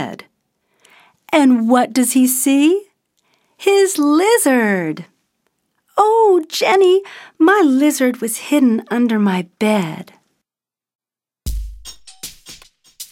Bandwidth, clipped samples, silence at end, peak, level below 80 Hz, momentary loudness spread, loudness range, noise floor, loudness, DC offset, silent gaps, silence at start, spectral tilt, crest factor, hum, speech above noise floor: 16.5 kHz; under 0.1%; 0.05 s; 0 dBFS; -40 dBFS; 20 LU; 8 LU; under -90 dBFS; -14 LUFS; under 0.1%; 10.95-10.99 s; 0 s; -4 dB/octave; 16 dB; none; over 76 dB